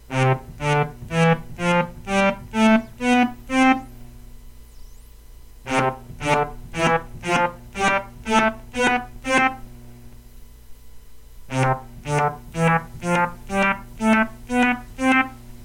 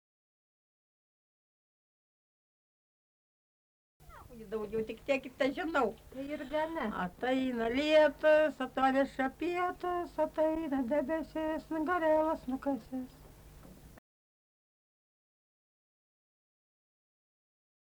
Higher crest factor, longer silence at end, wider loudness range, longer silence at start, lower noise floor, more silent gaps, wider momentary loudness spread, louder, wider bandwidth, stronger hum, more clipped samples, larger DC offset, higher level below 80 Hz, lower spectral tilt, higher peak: about the same, 20 dB vs 20 dB; second, 0 s vs 4 s; second, 5 LU vs 14 LU; second, 0.1 s vs 4.1 s; second, -43 dBFS vs -54 dBFS; neither; second, 6 LU vs 14 LU; first, -21 LUFS vs -32 LUFS; second, 16.5 kHz vs over 20 kHz; neither; neither; neither; first, -42 dBFS vs -62 dBFS; about the same, -5.5 dB/octave vs -5.5 dB/octave; first, -4 dBFS vs -16 dBFS